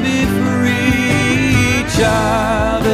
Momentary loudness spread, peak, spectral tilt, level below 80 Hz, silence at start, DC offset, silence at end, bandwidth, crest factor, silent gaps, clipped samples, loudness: 2 LU; -2 dBFS; -5 dB/octave; -28 dBFS; 0 s; under 0.1%; 0 s; 15.5 kHz; 12 dB; none; under 0.1%; -14 LUFS